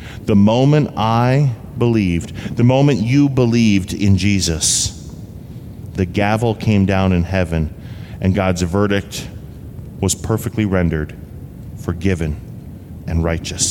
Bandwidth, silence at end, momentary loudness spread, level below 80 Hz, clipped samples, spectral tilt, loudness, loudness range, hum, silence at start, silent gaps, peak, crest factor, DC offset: 16.5 kHz; 0 s; 20 LU; -34 dBFS; under 0.1%; -5.5 dB/octave; -16 LUFS; 6 LU; none; 0 s; none; -4 dBFS; 14 dB; under 0.1%